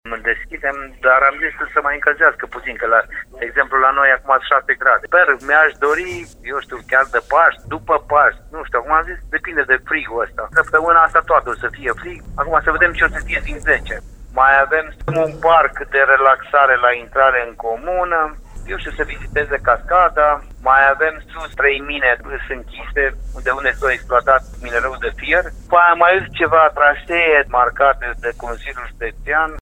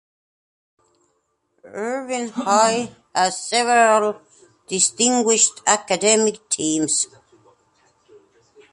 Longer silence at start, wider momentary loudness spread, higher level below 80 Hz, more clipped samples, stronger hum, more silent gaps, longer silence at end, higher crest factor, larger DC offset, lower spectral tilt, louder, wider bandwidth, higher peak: second, 0.05 s vs 1.65 s; about the same, 14 LU vs 12 LU; first, -34 dBFS vs -68 dBFS; neither; neither; neither; second, 0 s vs 1.65 s; about the same, 16 dB vs 18 dB; neither; first, -5 dB/octave vs -1.5 dB/octave; first, -15 LUFS vs -18 LUFS; about the same, 12 kHz vs 11.5 kHz; first, 0 dBFS vs -4 dBFS